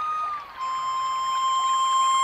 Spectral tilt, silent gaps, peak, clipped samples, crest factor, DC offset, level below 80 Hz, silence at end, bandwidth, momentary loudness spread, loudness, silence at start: 1.5 dB/octave; none; -14 dBFS; under 0.1%; 10 dB; under 0.1%; -64 dBFS; 0 s; 12.5 kHz; 10 LU; -24 LUFS; 0 s